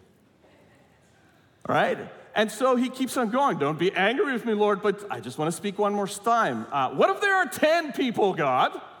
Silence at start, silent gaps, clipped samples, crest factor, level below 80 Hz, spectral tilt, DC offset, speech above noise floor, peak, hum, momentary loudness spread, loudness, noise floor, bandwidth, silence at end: 1.7 s; none; under 0.1%; 16 dB; -74 dBFS; -4.5 dB/octave; under 0.1%; 34 dB; -8 dBFS; none; 6 LU; -25 LUFS; -59 dBFS; 18 kHz; 0 s